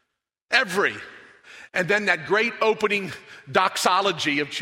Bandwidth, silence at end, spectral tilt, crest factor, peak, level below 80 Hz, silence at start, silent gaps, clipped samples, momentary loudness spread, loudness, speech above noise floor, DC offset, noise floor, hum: 16 kHz; 0 s; -3 dB/octave; 22 dB; -2 dBFS; -68 dBFS; 0.5 s; none; under 0.1%; 11 LU; -22 LUFS; 55 dB; under 0.1%; -78 dBFS; none